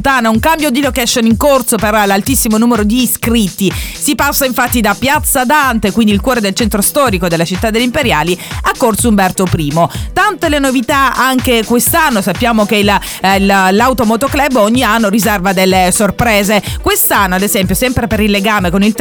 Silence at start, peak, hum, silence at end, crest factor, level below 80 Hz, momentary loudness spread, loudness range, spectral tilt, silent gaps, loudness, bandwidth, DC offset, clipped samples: 0 s; 0 dBFS; none; 0 s; 10 dB; -28 dBFS; 4 LU; 2 LU; -4 dB/octave; none; -11 LUFS; over 20 kHz; under 0.1%; under 0.1%